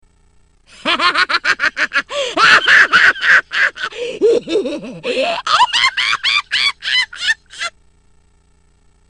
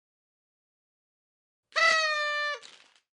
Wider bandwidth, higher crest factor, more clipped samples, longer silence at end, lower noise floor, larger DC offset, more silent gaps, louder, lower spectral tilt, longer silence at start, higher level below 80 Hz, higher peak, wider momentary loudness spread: about the same, 10.5 kHz vs 11.5 kHz; about the same, 16 dB vs 20 dB; neither; first, 1.4 s vs 0.5 s; about the same, -53 dBFS vs -55 dBFS; neither; neither; first, -13 LUFS vs -26 LUFS; first, -1 dB/octave vs 2 dB/octave; second, 0.85 s vs 1.75 s; first, -54 dBFS vs -90 dBFS; first, 0 dBFS vs -12 dBFS; first, 14 LU vs 11 LU